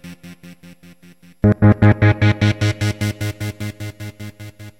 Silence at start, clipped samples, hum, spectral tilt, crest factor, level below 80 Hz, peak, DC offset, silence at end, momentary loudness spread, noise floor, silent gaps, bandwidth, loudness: 0.05 s; under 0.1%; none; -7 dB/octave; 18 dB; -38 dBFS; 0 dBFS; 0.2%; 0.1 s; 22 LU; -47 dBFS; none; 14 kHz; -17 LUFS